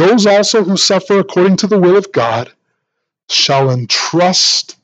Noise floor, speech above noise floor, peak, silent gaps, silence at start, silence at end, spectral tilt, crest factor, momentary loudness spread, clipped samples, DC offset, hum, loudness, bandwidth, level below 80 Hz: -73 dBFS; 62 dB; 0 dBFS; none; 0 s; 0.2 s; -4 dB/octave; 12 dB; 6 LU; under 0.1%; under 0.1%; none; -11 LUFS; 9 kHz; -60 dBFS